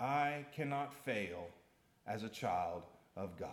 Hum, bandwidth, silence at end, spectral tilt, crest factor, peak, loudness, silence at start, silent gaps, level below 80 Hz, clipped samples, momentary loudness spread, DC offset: none; 17.5 kHz; 0 s; -5.5 dB/octave; 18 dB; -24 dBFS; -41 LUFS; 0 s; none; -78 dBFS; under 0.1%; 13 LU; under 0.1%